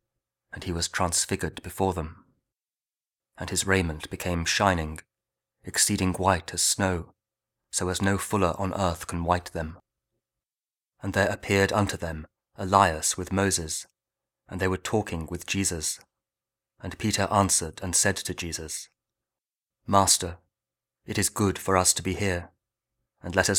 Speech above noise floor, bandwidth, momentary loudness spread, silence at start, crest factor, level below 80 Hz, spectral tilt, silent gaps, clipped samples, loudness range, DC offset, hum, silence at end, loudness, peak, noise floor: over 64 dB; 18.5 kHz; 14 LU; 0.55 s; 26 dB; -48 dBFS; -3.5 dB/octave; none; under 0.1%; 4 LU; under 0.1%; none; 0 s; -26 LUFS; -2 dBFS; under -90 dBFS